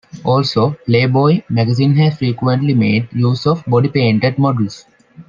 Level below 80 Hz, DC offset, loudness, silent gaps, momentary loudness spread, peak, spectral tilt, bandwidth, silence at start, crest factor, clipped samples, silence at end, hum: -54 dBFS; under 0.1%; -15 LUFS; none; 4 LU; 0 dBFS; -8 dB/octave; 7.4 kHz; 0.15 s; 14 dB; under 0.1%; 0.05 s; none